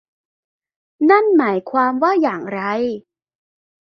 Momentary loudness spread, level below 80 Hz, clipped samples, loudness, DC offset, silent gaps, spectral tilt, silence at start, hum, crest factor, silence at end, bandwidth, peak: 10 LU; -66 dBFS; under 0.1%; -17 LUFS; under 0.1%; none; -7.5 dB/octave; 1 s; none; 16 dB; 0.8 s; 6.2 kHz; -2 dBFS